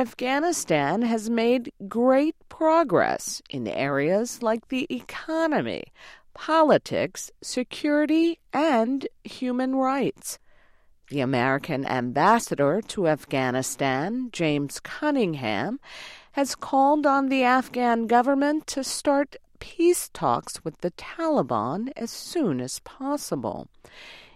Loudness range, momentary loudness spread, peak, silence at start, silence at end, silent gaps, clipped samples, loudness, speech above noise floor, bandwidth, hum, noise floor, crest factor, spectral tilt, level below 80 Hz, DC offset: 4 LU; 12 LU; -8 dBFS; 0 s; 0.15 s; none; under 0.1%; -24 LUFS; 32 dB; 15.5 kHz; none; -56 dBFS; 18 dB; -4.5 dB/octave; -60 dBFS; under 0.1%